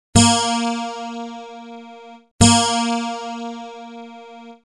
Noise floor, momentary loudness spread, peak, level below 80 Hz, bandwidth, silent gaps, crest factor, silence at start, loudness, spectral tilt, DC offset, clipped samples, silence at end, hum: -41 dBFS; 25 LU; 0 dBFS; -40 dBFS; 12 kHz; 2.31-2.39 s; 20 dB; 0.15 s; -18 LUFS; -3.5 dB/octave; under 0.1%; under 0.1%; 0.2 s; none